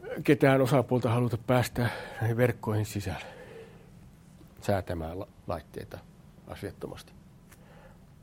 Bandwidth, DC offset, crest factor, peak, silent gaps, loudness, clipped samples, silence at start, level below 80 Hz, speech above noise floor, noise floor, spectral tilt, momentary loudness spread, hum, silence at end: 16.5 kHz; under 0.1%; 22 dB; -8 dBFS; none; -29 LUFS; under 0.1%; 0 s; -56 dBFS; 25 dB; -54 dBFS; -7 dB/octave; 21 LU; none; 0.35 s